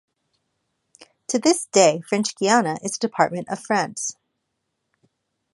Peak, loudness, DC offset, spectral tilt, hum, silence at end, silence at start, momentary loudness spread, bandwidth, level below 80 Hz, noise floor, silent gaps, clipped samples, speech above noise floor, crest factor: -2 dBFS; -21 LUFS; under 0.1%; -3.5 dB/octave; none; 1.4 s; 1 s; 12 LU; 11.5 kHz; -72 dBFS; -77 dBFS; none; under 0.1%; 56 dB; 22 dB